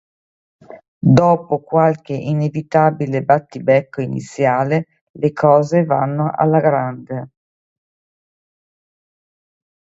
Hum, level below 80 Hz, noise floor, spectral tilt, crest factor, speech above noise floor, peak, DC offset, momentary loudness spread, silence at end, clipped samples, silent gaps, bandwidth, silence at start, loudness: none; -54 dBFS; under -90 dBFS; -8.5 dB/octave; 18 dB; over 74 dB; 0 dBFS; under 0.1%; 11 LU; 2.55 s; under 0.1%; 0.88-1.01 s, 5.01-5.14 s; 8 kHz; 0.7 s; -16 LUFS